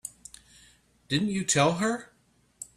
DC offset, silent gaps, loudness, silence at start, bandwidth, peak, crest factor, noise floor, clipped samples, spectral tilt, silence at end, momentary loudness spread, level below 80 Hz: under 0.1%; none; -26 LUFS; 0.05 s; 15 kHz; -10 dBFS; 20 dB; -60 dBFS; under 0.1%; -4 dB/octave; 0.1 s; 23 LU; -62 dBFS